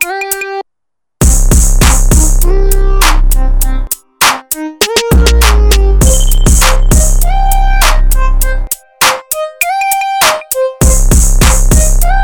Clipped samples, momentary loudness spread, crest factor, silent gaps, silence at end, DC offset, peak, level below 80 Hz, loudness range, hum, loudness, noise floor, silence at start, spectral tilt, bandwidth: under 0.1%; 7 LU; 8 dB; none; 0 s; under 0.1%; 0 dBFS; -8 dBFS; 2 LU; none; -10 LUFS; -79 dBFS; 0 s; -3.5 dB/octave; 19.5 kHz